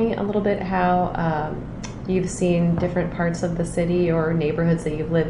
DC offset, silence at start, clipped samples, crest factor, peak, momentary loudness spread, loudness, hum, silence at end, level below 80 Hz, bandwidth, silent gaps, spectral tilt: under 0.1%; 0 s; under 0.1%; 14 dB; -8 dBFS; 5 LU; -22 LUFS; none; 0 s; -40 dBFS; 11 kHz; none; -7 dB/octave